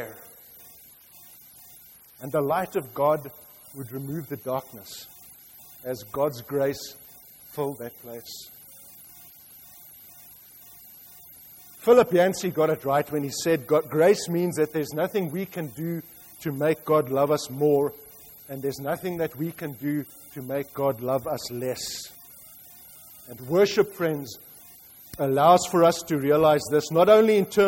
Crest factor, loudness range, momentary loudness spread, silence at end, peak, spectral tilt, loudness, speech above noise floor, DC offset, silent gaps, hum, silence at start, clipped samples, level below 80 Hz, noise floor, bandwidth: 20 dB; 12 LU; 25 LU; 0 s; -6 dBFS; -5.5 dB/octave; -24 LUFS; 27 dB; under 0.1%; none; none; 0 s; under 0.1%; -64 dBFS; -51 dBFS; 16.5 kHz